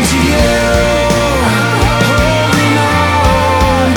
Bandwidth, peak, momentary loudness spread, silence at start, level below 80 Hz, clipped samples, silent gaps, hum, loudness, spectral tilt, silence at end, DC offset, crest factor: over 20 kHz; 0 dBFS; 1 LU; 0 s; -20 dBFS; under 0.1%; none; none; -10 LUFS; -5 dB/octave; 0 s; under 0.1%; 10 dB